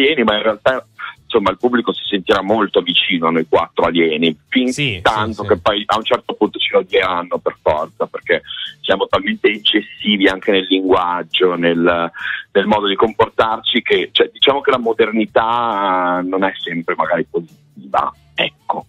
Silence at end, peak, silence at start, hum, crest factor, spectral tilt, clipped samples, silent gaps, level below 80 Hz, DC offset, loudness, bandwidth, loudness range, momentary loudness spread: 0.05 s; -2 dBFS; 0 s; none; 14 dB; -5 dB/octave; under 0.1%; none; -48 dBFS; under 0.1%; -16 LUFS; 12 kHz; 3 LU; 6 LU